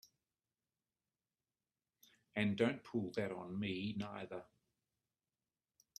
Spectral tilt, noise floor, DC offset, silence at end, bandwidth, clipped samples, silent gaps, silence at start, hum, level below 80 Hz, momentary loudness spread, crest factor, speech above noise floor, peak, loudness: -6.5 dB/octave; under -90 dBFS; under 0.1%; 1.55 s; 13 kHz; under 0.1%; none; 2.35 s; none; -78 dBFS; 12 LU; 24 dB; over 50 dB; -20 dBFS; -41 LUFS